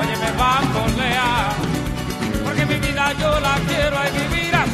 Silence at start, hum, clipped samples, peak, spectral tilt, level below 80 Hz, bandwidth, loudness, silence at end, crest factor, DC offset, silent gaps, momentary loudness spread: 0 s; none; under 0.1%; -4 dBFS; -4.5 dB/octave; -32 dBFS; 14 kHz; -19 LUFS; 0 s; 16 dB; under 0.1%; none; 6 LU